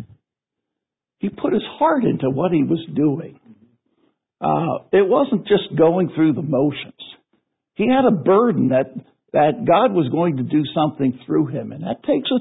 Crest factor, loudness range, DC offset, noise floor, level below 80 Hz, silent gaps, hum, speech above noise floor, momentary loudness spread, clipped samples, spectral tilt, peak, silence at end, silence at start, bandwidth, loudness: 16 dB; 3 LU; under 0.1%; -84 dBFS; -60 dBFS; none; none; 66 dB; 13 LU; under 0.1%; -12 dB/octave; -4 dBFS; 0 s; 0 s; 4 kHz; -19 LUFS